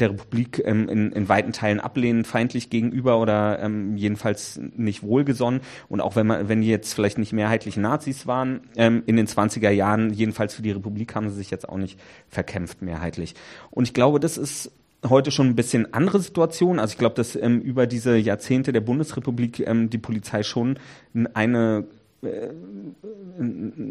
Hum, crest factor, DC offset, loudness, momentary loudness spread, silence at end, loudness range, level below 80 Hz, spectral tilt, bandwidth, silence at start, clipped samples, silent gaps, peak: none; 20 dB; under 0.1%; -23 LUFS; 12 LU; 0 s; 5 LU; -56 dBFS; -6 dB/octave; 13.5 kHz; 0 s; under 0.1%; none; -2 dBFS